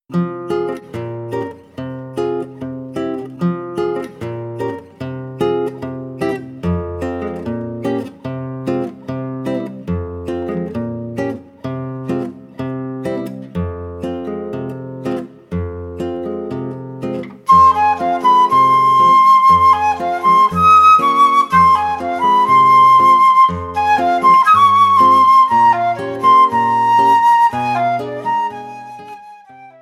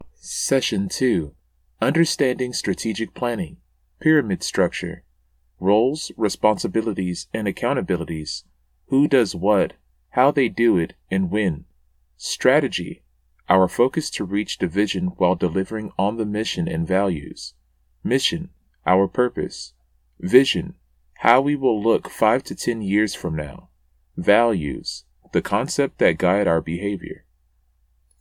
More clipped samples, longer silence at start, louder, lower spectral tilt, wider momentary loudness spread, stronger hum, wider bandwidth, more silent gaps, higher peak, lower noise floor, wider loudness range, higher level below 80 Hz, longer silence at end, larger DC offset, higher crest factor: neither; about the same, 0.1 s vs 0 s; first, -14 LUFS vs -21 LUFS; about the same, -6 dB/octave vs -5 dB/octave; first, 18 LU vs 13 LU; neither; second, 12.5 kHz vs 16 kHz; neither; about the same, -2 dBFS vs 0 dBFS; second, -39 dBFS vs -62 dBFS; first, 14 LU vs 3 LU; about the same, -46 dBFS vs -48 dBFS; second, 0.1 s vs 1.05 s; neither; second, 14 dB vs 22 dB